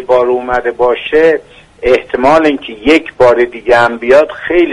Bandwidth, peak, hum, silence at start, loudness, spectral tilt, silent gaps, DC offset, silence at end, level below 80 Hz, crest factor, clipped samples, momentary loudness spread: 11 kHz; 0 dBFS; none; 0 s; -10 LUFS; -5.5 dB/octave; none; under 0.1%; 0 s; -36 dBFS; 10 dB; 0.2%; 5 LU